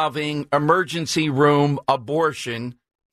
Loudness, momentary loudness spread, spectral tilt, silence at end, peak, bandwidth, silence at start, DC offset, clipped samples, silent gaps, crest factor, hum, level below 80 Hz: -20 LUFS; 11 LU; -5.5 dB/octave; 0.4 s; -4 dBFS; 14 kHz; 0 s; under 0.1%; under 0.1%; none; 16 dB; none; -60 dBFS